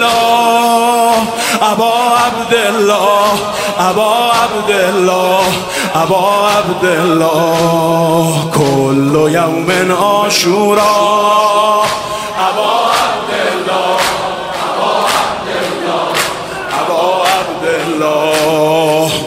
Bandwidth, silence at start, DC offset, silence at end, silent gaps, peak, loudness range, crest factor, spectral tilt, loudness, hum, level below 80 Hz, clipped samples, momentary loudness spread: 16.5 kHz; 0 s; under 0.1%; 0 s; none; 0 dBFS; 3 LU; 12 dB; -4 dB/octave; -11 LUFS; none; -46 dBFS; under 0.1%; 5 LU